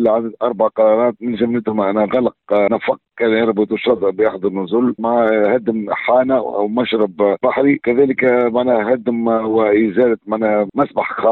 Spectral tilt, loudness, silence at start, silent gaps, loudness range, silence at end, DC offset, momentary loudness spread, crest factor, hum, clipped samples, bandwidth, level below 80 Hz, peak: -9.5 dB/octave; -16 LUFS; 0 s; none; 2 LU; 0 s; under 0.1%; 5 LU; 12 dB; none; under 0.1%; 4.3 kHz; -56 dBFS; -2 dBFS